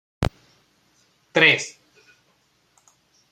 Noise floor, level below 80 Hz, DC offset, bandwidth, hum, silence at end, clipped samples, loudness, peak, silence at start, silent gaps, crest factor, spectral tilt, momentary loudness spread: -64 dBFS; -46 dBFS; under 0.1%; 16 kHz; none; 1.6 s; under 0.1%; -19 LUFS; -2 dBFS; 0.2 s; none; 26 dB; -3.5 dB/octave; 14 LU